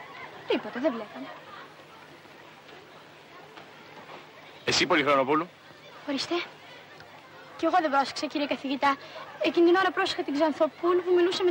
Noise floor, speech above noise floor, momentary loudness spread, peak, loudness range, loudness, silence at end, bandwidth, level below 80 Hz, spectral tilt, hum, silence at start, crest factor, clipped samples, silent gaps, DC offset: -50 dBFS; 24 dB; 25 LU; -10 dBFS; 14 LU; -26 LUFS; 0 s; 16 kHz; -72 dBFS; -3.5 dB/octave; none; 0 s; 18 dB; under 0.1%; none; under 0.1%